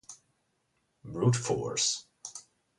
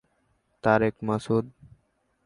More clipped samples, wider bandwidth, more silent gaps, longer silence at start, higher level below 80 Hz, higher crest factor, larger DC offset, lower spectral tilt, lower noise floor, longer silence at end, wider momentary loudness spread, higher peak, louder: neither; about the same, 11.5 kHz vs 11 kHz; neither; second, 0.1 s vs 0.65 s; second, -64 dBFS vs -58 dBFS; about the same, 20 dB vs 22 dB; neither; second, -4 dB/octave vs -7.5 dB/octave; first, -76 dBFS vs -70 dBFS; second, 0.35 s vs 0.75 s; first, 18 LU vs 7 LU; second, -14 dBFS vs -6 dBFS; second, -29 LUFS vs -26 LUFS